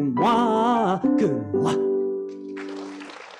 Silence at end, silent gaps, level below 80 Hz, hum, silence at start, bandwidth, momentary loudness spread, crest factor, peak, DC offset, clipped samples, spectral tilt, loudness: 0 s; none; -62 dBFS; none; 0 s; 11 kHz; 15 LU; 14 dB; -8 dBFS; under 0.1%; under 0.1%; -6.5 dB/octave; -22 LUFS